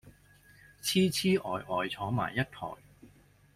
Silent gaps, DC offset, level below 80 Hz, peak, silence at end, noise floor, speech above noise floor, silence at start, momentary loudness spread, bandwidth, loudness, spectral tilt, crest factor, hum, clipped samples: none; under 0.1%; -62 dBFS; -16 dBFS; 0.5 s; -60 dBFS; 30 dB; 0.05 s; 14 LU; 16 kHz; -31 LUFS; -4.5 dB/octave; 18 dB; none; under 0.1%